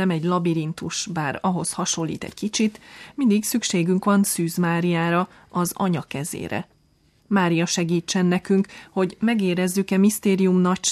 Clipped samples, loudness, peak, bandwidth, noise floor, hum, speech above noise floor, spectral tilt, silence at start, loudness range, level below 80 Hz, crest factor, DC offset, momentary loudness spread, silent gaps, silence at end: under 0.1%; -22 LUFS; -8 dBFS; 14.5 kHz; -60 dBFS; none; 39 dB; -5 dB/octave; 0 s; 3 LU; -60 dBFS; 14 dB; under 0.1%; 9 LU; none; 0 s